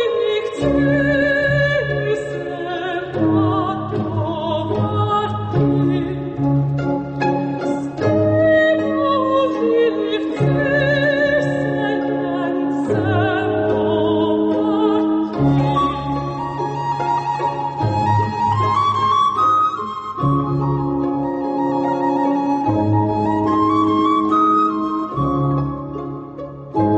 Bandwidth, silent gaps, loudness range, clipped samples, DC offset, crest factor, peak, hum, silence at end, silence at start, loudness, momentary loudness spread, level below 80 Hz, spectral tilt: 8.4 kHz; none; 3 LU; under 0.1%; under 0.1%; 12 dB; -6 dBFS; none; 0 s; 0 s; -18 LUFS; 7 LU; -44 dBFS; -8 dB/octave